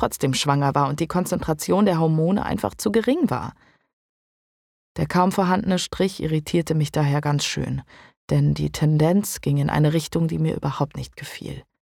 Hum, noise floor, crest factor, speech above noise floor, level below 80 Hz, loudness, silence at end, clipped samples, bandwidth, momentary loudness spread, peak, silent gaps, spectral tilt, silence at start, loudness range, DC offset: none; under -90 dBFS; 18 dB; over 69 dB; -46 dBFS; -22 LUFS; 0.2 s; under 0.1%; 16.5 kHz; 10 LU; -4 dBFS; 3.93-4.95 s, 8.17-8.28 s; -6 dB/octave; 0 s; 3 LU; under 0.1%